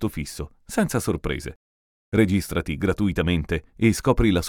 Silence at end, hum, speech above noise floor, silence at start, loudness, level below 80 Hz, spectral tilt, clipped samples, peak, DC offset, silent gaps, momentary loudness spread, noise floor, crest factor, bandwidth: 0 s; none; over 67 dB; 0 s; -24 LUFS; -36 dBFS; -6 dB/octave; under 0.1%; -4 dBFS; under 0.1%; 1.56-2.12 s; 11 LU; under -90 dBFS; 20 dB; 18.5 kHz